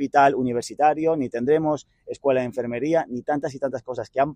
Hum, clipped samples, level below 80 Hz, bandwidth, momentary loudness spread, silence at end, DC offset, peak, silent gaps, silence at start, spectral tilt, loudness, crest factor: none; under 0.1%; -60 dBFS; 11 kHz; 10 LU; 0 s; under 0.1%; -4 dBFS; none; 0 s; -6 dB/octave; -23 LUFS; 18 dB